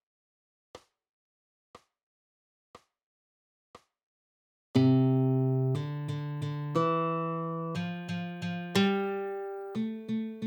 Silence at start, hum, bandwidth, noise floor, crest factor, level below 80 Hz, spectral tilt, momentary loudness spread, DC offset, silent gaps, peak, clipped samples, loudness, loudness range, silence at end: 0.75 s; none; 19 kHz; under -90 dBFS; 20 dB; -76 dBFS; -7.5 dB/octave; 11 LU; under 0.1%; 1.09-1.74 s, 2.03-2.74 s, 3.03-3.74 s, 4.03-4.74 s; -12 dBFS; under 0.1%; -30 LUFS; 4 LU; 0 s